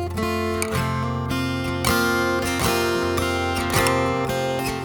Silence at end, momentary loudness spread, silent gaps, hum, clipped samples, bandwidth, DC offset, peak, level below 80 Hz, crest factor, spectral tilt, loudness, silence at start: 0 s; 5 LU; none; none; under 0.1%; over 20 kHz; under 0.1%; -4 dBFS; -40 dBFS; 18 dB; -4.5 dB/octave; -22 LUFS; 0 s